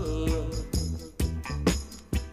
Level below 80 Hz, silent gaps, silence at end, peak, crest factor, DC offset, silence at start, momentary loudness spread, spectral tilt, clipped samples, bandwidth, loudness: -34 dBFS; none; 0 s; -10 dBFS; 20 dB; under 0.1%; 0 s; 6 LU; -5.5 dB/octave; under 0.1%; 15.5 kHz; -31 LUFS